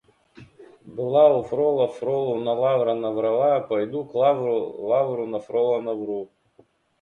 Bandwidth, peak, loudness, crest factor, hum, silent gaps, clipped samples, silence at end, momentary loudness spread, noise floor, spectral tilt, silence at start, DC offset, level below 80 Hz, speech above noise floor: 6.8 kHz; -6 dBFS; -23 LUFS; 18 dB; none; none; under 0.1%; 0.75 s; 11 LU; -59 dBFS; -8 dB/octave; 0.35 s; under 0.1%; -66 dBFS; 37 dB